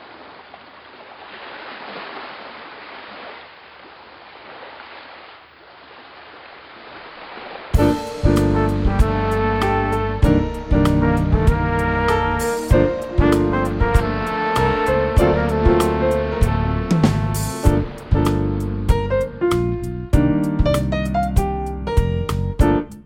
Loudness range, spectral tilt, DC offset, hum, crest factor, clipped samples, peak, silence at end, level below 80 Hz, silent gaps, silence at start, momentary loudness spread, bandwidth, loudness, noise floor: 19 LU; -7 dB/octave; under 0.1%; none; 18 dB; under 0.1%; 0 dBFS; 0.05 s; -26 dBFS; none; 0 s; 21 LU; 17 kHz; -19 LUFS; -44 dBFS